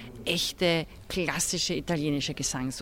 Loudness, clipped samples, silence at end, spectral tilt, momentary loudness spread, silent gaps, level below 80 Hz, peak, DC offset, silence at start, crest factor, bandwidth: -28 LUFS; under 0.1%; 0 s; -3.5 dB/octave; 4 LU; none; -50 dBFS; -12 dBFS; under 0.1%; 0 s; 18 dB; 17 kHz